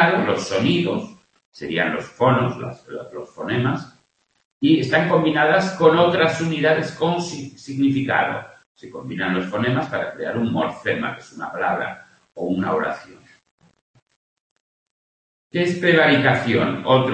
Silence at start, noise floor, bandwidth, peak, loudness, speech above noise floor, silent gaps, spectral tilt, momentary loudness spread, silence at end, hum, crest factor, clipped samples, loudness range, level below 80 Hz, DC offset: 0 s; -63 dBFS; 8.8 kHz; 0 dBFS; -20 LUFS; 43 dB; 1.45-1.52 s, 4.45-4.60 s, 8.66-8.75 s, 13.51-13.58 s, 13.81-13.94 s, 14.02-14.06 s, 14.16-15.50 s; -6 dB/octave; 16 LU; 0 s; none; 20 dB; under 0.1%; 9 LU; -60 dBFS; under 0.1%